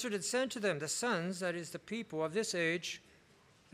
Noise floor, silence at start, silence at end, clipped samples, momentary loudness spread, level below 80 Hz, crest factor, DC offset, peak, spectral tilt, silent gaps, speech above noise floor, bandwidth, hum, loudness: -65 dBFS; 0 s; 0.75 s; under 0.1%; 9 LU; -78 dBFS; 16 dB; under 0.1%; -22 dBFS; -3.5 dB/octave; none; 29 dB; 15.5 kHz; none; -36 LUFS